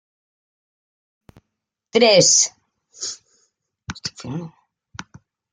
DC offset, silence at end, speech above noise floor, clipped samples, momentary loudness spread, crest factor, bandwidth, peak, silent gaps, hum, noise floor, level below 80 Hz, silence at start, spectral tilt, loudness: under 0.1%; 1.05 s; 64 dB; under 0.1%; 27 LU; 20 dB; 10.5 kHz; -2 dBFS; none; none; -81 dBFS; -62 dBFS; 1.95 s; -2 dB/octave; -17 LUFS